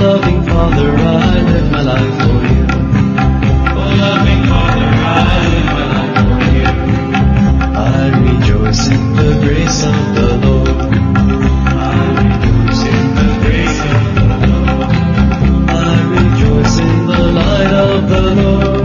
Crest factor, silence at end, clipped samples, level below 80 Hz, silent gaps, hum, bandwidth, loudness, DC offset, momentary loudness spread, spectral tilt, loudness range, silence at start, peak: 10 dB; 0 s; under 0.1%; -16 dBFS; none; none; 7.2 kHz; -11 LUFS; under 0.1%; 2 LU; -6.5 dB/octave; 1 LU; 0 s; 0 dBFS